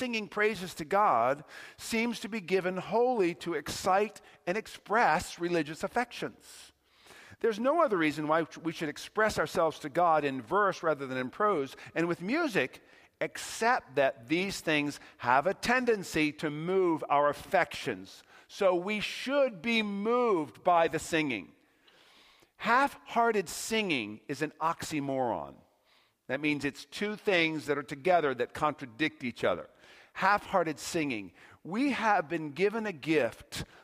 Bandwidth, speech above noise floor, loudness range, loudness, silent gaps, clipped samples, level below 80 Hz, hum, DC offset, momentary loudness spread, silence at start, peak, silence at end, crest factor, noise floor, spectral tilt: 15.5 kHz; 38 dB; 3 LU; -30 LUFS; none; under 0.1%; -64 dBFS; none; under 0.1%; 10 LU; 0 s; -10 dBFS; 0.2 s; 20 dB; -68 dBFS; -4.5 dB/octave